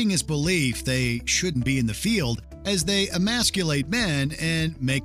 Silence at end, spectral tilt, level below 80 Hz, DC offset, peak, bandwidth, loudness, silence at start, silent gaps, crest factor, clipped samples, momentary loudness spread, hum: 0 s; -4 dB/octave; -42 dBFS; under 0.1%; -8 dBFS; 15.5 kHz; -24 LUFS; 0 s; none; 16 dB; under 0.1%; 3 LU; none